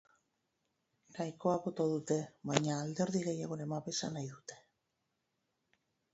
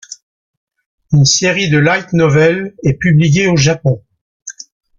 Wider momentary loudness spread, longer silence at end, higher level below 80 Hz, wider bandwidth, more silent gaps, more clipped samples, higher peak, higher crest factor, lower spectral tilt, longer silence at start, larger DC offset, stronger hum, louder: second, 11 LU vs 20 LU; first, 1.55 s vs 0.5 s; second, -78 dBFS vs -44 dBFS; about the same, 8 kHz vs 7.6 kHz; second, none vs 0.23-0.67 s, 0.86-0.98 s, 4.21-4.40 s; neither; second, -10 dBFS vs 0 dBFS; first, 28 dB vs 14 dB; about the same, -5.5 dB/octave vs -5 dB/octave; first, 1.1 s vs 0.1 s; neither; neither; second, -37 LUFS vs -12 LUFS